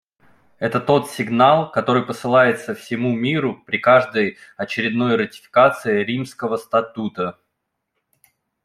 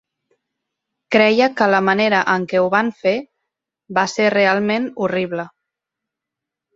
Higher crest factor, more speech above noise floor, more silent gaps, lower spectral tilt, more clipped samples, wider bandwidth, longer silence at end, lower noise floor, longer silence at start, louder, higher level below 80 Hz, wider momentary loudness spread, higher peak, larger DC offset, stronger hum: about the same, 18 dB vs 18 dB; second, 58 dB vs 68 dB; neither; about the same, -6 dB/octave vs -5 dB/octave; neither; first, 14.5 kHz vs 7.8 kHz; about the same, 1.35 s vs 1.25 s; second, -76 dBFS vs -84 dBFS; second, 0.6 s vs 1.1 s; about the same, -19 LUFS vs -17 LUFS; about the same, -62 dBFS vs -64 dBFS; first, 11 LU vs 8 LU; about the same, 0 dBFS vs -2 dBFS; neither; neither